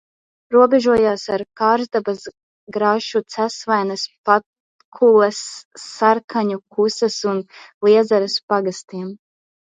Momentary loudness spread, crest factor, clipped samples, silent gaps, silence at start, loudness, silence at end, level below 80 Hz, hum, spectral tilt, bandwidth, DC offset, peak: 16 LU; 18 dB; under 0.1%; 2.43-2.67 s, 4.18-4.24 s, 4.46-4.53 s, 4.60-4.92 s, 5.65-5.71 s, 6.24-6.28 s, 7.74-7.81 s, 8.43-8.48 s; 0.5 s; -18 LUFS; 0.6 s; -62 dBFS; none; -4.5 dB/octave; 9.4 kHz; under 0.1%; 0 dBFS